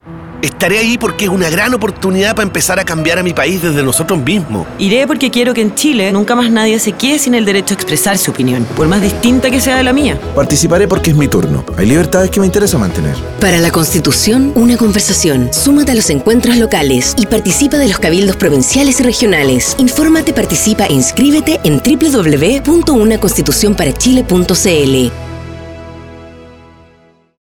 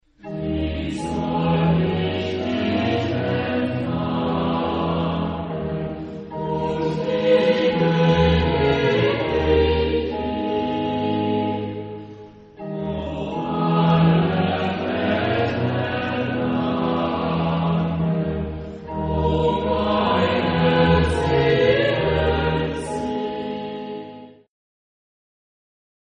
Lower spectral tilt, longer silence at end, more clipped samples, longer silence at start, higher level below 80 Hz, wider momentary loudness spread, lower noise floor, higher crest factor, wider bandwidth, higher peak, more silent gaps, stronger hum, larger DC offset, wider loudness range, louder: second, -4 dB/octave vs -7.5 dB/octave; second, 0.95 s vs 1.75 s; neither; second, 0.05 s vs 0.25 s; first, -28 dBFS vs -36 dBFS; second, 5 LU vs 11 LU; first, -47 dBFS vs -41 dBFS; second, 10 dB vs 16 dB; first, 18.5 kHz vs 8.4 kHz; first, 0 dBFS vs -4 dBFS; neither; neither; neither; second, 2 LU vs 6 LU; first, -10 LUFS vs -21 LUFS